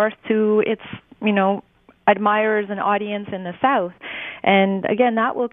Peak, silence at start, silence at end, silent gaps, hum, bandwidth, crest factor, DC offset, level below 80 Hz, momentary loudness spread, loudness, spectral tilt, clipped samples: 0 dBFS; 0 s; 0.05 s; none; none; 3.8 kHz; 20 dB; under 0.1%; -64 dBFS; 11 LU; -20 LUFS; -10 dB/octave; under 0.1%